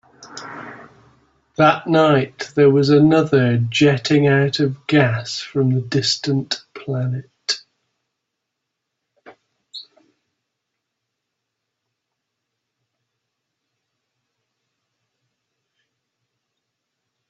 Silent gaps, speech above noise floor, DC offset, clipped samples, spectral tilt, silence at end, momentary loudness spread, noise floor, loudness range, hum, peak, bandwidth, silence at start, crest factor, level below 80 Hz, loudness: none; 63 dB; under 0.1%; under 0.1%; -6 dB/octave; 7.45 s; 21 LU; -79 dBFS; 14 LU; none; -2 dBFS; 8 kHz; 0.2 s; 20 dB; -60 dBFS; -17 LUFS